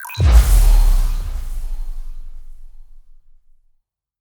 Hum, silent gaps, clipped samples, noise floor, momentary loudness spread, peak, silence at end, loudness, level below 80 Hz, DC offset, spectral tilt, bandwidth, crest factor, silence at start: none; none; under 0.1%; -63 dBFS; 23 LU; 0 dBFS; 1.2 s; -17 LUFS; -16 dBFS; under 0.1%; -5 dB/octave; over 20 kHz; 16 dB; 0 s